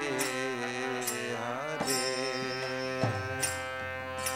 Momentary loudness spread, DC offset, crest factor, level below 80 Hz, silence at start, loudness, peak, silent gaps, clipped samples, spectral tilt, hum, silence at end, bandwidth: 5 LU; under 0.1%; 18 dB; -66 dBFS; 0 s; -32 LUFS; -16 dBFS; none; under 0.1%; -3 dB/octave; none; 0 s; 16.5 kHz